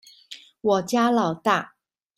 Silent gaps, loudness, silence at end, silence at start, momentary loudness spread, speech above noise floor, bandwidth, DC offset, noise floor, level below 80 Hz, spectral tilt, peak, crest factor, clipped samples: none; -23 LUFS; 0.5 s; 0.3 s; 21 LU; 25 dB; 14.5 kHz; under 0.1%; -46 dBFS; -68 dBFS; -5 dB/octave; -6 dBFS; 18 dB; under 0.1%